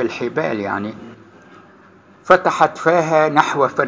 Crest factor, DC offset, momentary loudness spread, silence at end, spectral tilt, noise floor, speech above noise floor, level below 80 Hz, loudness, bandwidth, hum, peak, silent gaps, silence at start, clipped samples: 18 dB; under 0.1%; 10 LU; 0 s; -5.5 dB/octave; -47 dBFS; 30 dB; -58 dBFS; -16 LUFS; 8 kHz; none; 0 dBFS; none; 0 s; under 0.1%